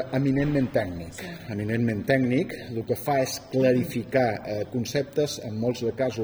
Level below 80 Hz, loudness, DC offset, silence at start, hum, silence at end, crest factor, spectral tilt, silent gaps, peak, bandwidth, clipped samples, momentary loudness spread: -54 dBFS; -26 LUFS; under 0.1%; 0 s; none; 0 s; 18 dB; -6 dB/octave; none; -8 dBFS; over 20 kHz; under 0.1%; 10 LU